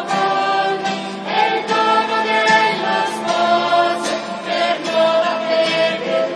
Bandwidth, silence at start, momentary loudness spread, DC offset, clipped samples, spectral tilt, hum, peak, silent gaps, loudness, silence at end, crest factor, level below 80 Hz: 11 kHz; 0 s; 7 LU; under 0.1%; under 0.1%; -3.5 dB/octave; none; -2 dBFS; none; -17 LUFS; 0 s; 16 dB; -72 dBFS